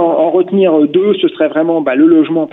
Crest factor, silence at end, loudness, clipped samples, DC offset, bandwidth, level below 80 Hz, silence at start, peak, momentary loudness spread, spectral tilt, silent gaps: 10 dB; 0.05 s; -11 LUFS; under 0.1%; under 0.1%; 3.9 kHz; -60 dBFS; 0 s; 0 dBFS; 4 LU; -9.5 dB/octave; none